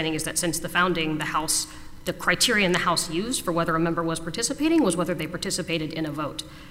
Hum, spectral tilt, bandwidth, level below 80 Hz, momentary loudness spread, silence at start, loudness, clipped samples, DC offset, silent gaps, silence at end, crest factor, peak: none; -3 dB/octave; 16 kHz; -46 dBFS; 9 LU; 0 s; -24 LUFS; under 0.1%; under 0.1%; none; 0 s; 18 dB; -8 dBFS